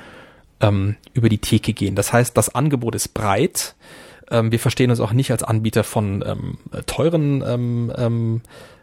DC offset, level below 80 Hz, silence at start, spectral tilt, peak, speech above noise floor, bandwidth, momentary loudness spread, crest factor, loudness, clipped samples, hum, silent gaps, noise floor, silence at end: under 0.1%; -44 dBFS; 0 s; -5.5 dB/octave; -2 dBFS; 26 dB; 16.5 kHz; 7 LU; 18 dB; -20 LUFS; under 0.1%; none; none; -45 dBFS; 0.15 s